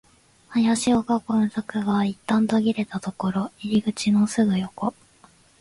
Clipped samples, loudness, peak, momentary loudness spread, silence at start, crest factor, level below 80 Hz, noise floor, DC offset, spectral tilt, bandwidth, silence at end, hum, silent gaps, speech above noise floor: under 0.1%; -23 LUFS; -8 dBFS; 8 LU; 0.5 s; 16 dB; -58 dBFS; -55 dBFS; under 0.1%; -5.5 dB/octave; 11.5 kHz; 0.7 s; none; none; 33 dB